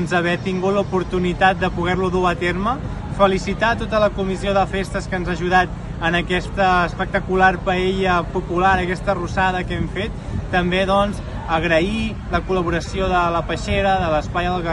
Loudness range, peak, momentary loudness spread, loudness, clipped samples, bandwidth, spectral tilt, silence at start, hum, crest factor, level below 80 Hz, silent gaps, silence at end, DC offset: 2 LU; -2 dBFS; 7 LU; -19 LUFS; under 0.1%; 11.5 kHz; -6 dB/octave; 0 s; none; 18 dB; -32 dBFS; none; 0 s; under 0.1%